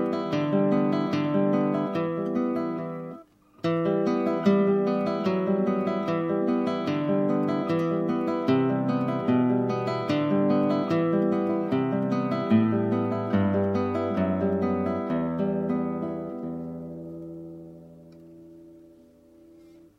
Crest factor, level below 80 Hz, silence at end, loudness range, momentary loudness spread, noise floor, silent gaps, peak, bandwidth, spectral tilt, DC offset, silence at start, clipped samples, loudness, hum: 16 dB; -66 dBFS; 1.2 s; 7 LU; 11 LU; -54 dBFS; none; -10 dBFS; 7.4 kHz; -9 dB/octave; under 0.1%; 0 s; under 0.1%; -26 LUFS; none